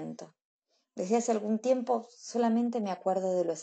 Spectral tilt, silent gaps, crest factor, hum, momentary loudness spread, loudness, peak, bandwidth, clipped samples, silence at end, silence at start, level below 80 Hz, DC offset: -5.5 dB/octave; 0.45-0.59 s; 16 dB; none; 12 LU; -30 LUFS; -14 dBFS; 8.8 kHz; under 0.1%; 0 s; 0 s; -88 dBFS; under 0.1%